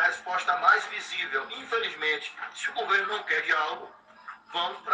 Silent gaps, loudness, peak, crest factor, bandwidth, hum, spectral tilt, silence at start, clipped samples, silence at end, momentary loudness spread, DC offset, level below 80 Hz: none; -27 LUFS; -8 dBFS; 22 dB; 9.6 kHz; none; -0.5 dB/octave; 0 s; under 0.1%; 0 s; 15 LU; under 0.1%; -78 dBFS